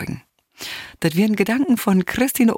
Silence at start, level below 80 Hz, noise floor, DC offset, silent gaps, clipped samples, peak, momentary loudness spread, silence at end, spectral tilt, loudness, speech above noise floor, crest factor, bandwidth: 0 s; -52 dBFS; -40 dBFS; under 0.1%; none; under 0.1%; -4 dBFS; 14 LU; 0 s; -5.5 dB/octave; -19 LUFS; 23 dB; 16 dB; 17 kHz